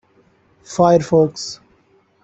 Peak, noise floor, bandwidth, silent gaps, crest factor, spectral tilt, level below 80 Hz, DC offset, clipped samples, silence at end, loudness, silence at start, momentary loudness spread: -2 dBFS; -57 dBFS; 8.2 kHz; none; 18 dB; -6 dB/octave; -54 dBFS; under 0.1%; under 0.1%; 0.7 s; -16 LUFS; 0.7 s; 16 LU